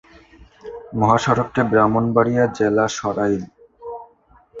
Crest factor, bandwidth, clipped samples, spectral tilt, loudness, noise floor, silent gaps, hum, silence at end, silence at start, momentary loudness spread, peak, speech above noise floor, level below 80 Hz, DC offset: 18 dB; 7.8 kHz; under 0.1%; -6.5 dB/octave; -18 LUFS; -53 dBFS; none; none; 0 s; 0.65 s; 21 LU; -2 dBFS; 35 dB; -50 dBFS; under 0.1%